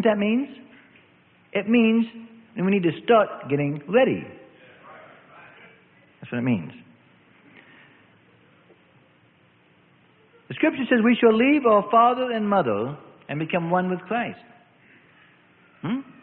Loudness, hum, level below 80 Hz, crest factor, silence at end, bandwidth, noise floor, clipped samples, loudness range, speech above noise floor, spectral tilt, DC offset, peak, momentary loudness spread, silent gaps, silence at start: -22 LUFS; none; -68 dBFS; 20 dB; 0.2 s; 4.2 kHz; -58 dBFS; under 0.1%; 13 LU; 37 dB; -11 dB/octave; under 0.1%; -4 dBFS; 17 LU; none; 0 s